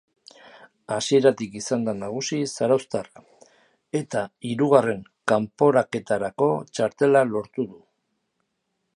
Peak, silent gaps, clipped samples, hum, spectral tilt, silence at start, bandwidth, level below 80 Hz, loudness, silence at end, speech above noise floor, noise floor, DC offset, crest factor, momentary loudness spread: -4 dBFS; none; under 0.1%; none; -5 dB/octave; 0.9 s; 11.5 kHz; -66 dBFS; -23 LUFS; 1.25 s; 54 dB; -76 dBFS; under 0.1%; 22 dB; 12 LU